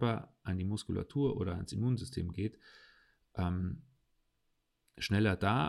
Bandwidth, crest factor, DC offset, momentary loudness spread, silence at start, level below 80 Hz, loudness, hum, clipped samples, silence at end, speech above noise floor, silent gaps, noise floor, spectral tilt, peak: 12 kHz; 18 dB; under 0.1%; 10 LU; 0 s; -60 dBFS; -36 LUFS; none; under 0.1%; 0 s; 45 dB; none; -79 dBFS; -7 dB/octave; -18 dBFS